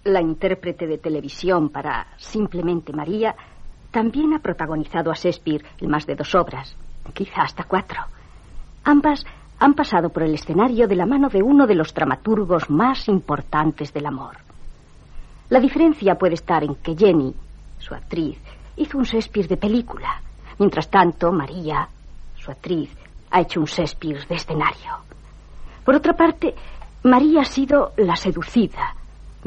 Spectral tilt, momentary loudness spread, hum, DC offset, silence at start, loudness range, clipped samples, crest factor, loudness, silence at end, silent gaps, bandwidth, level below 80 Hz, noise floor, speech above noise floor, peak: -7 dB/octave; 13 LU; none; under 0.1%; 0.05 s; 6 LU; under 0.1%; 18 dB; -20 LUFS; 0 s; none; 8.2 kHz; -38 dBFS; -41 dBFS; 22 dB; -2 dBFS